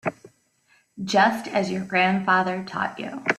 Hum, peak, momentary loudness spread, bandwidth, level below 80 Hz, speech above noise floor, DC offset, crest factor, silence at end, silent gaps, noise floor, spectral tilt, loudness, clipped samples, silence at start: none; -6 dBFS; 9 LU; 13.5 kHz; -66 dBFS; 40 dB; under 0.1%; 20 dB; 0 s; none; -63 dBFS; -5 dB/octave; -23 LUFS; under 0.1%; 0.05 s